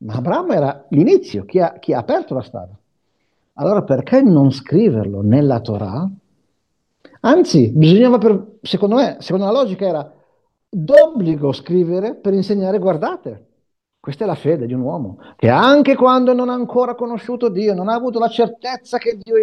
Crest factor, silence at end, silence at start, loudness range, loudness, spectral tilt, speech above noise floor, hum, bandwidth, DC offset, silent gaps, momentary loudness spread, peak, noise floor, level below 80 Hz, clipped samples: 16 dB; 0 s; 0 s; 5 LU; -16 LUFS; -8 dB/octave; 55 dB; none; 9.6 kHz; under 0.1%; none; 13 LU; 0 dBFS; -70 dBFS; -60 dBFS; under 0.1%